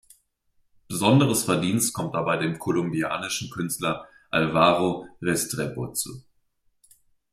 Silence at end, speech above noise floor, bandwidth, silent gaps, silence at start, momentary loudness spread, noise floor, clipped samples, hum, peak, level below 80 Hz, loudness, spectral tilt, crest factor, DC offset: 1.15 s; 44 dB; 16 kHz; none; 0.9 s; 10 LU; -68 dBFS; under 0.1%; none; -4 dBFS; -58 dBFS; -24 LUFS; -4.5 dB/octave; 22 dB; under 0.1%